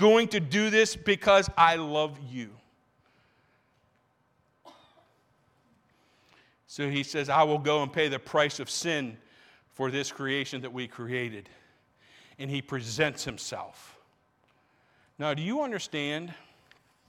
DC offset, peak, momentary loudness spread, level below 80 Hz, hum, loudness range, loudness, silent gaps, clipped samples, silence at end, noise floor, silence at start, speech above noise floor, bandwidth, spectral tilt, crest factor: under 0.1%; -8 dBFS; 17 LU; -60 dBFS; none; 9 LU; -28 LUFS; none; under 0.1%; 0.7 s; -70 dBFS; 0 s; 42 dB; 14.5 kHz; -4 dB/octave; 22 dB